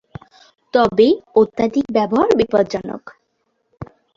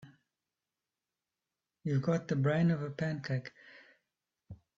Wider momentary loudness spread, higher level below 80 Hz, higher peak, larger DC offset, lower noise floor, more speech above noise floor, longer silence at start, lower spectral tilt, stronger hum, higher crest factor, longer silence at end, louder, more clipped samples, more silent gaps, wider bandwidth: first, 21 LU vs 10 LU; first, -50 dBFS vs -72 dBFS; first, -2 dBFS vs -18 dBFS; neither; second, -69 dBFS vs under -90 dBFS; second, 53 dB vs over 58 dB; first, 0.75 s vs 0 s; second, -6.5 dB/octave vs -8 dB/octave; neither; about the same, 16 dB vs 18 dB; about the same, 0.3 s vs 0.25 s; first, -16 LUFS vs -33 LUFS; neither; neither; about the same, 7.4 kHz vs 7.6 kHz